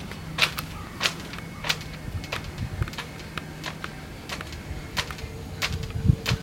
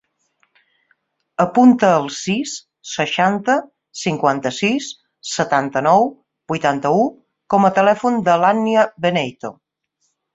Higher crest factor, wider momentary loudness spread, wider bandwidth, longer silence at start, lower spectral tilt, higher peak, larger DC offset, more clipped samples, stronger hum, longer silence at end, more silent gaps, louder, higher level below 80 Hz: first, 30 dB vs 18 dB; about the same, 12 LU vs 14 LU; first, 17 kHz vs 8 kHz; second, 0 s vs 1.4 s; about the same, -4 dB/octave vs -5 dB/octave; about the same, 0 dBFS vs 0 dBFS; neither; neither; neither; second, 0 s vs 0.8 s; neither; second, -30 LUFS vs -17 LUFS; first, -40 dBFS vs -60 dBFS